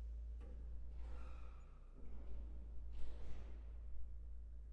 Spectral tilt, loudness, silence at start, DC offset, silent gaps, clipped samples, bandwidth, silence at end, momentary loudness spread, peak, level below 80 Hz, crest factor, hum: -8 dB/octave; -56 LUFS; 0 s; under 0.1%; none; under 0.1%; 4.5 kHz; 0 s; 5 LU; -30 dBFS; -52 dBFS; 16 dB; none